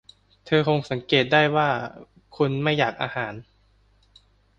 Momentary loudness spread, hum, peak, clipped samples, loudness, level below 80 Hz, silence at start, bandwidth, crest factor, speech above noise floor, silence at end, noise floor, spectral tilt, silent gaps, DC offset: 12 LU; 50 Hz at -45 dBFS; -4 dBFS; under 0.1%; -23 LUFS; -58 dBFS; 0.45 s; 7.6 kHz; 20 dB; 38 dB; 1.15 s; -61 dBFS; -6.5 dB/octave; none; under 0.1%